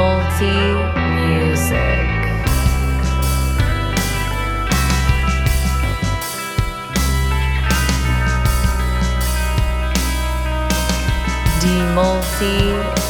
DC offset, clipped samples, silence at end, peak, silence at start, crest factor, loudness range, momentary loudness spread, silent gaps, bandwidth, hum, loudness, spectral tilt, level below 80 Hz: under 0.1%; under 0.1%; 0 s; -2 dBFS; 0 s; 16 dB; 1 LU; 4 LU; none; over 20 kHz; none; -18 LUFS; -5 dB/octave; -20 dBFS